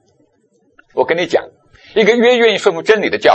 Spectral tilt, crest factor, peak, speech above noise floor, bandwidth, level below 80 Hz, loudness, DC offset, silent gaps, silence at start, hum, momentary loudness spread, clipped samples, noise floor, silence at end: -4 dB/octave; 14 dB; 0 dBFS; 45 dB; 8.6 kHz; -54 dBFS; -13 LUFS; under 0.1%; none; 0.95 s; none; 9 LU; under 0.1%; -58 dBFS; 0 s